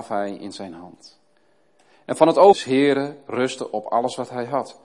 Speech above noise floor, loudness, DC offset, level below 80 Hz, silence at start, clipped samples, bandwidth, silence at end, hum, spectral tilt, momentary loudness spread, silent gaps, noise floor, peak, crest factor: 42 dB; -20 LUFS; under 0.1%; -68 dBFS; 0 s; under 0.1%; 11.5 kHz; 0.1 s; none; -5 dB/octave; 20 LU; none; -63 dBFS; 0 dBFS; 20 dB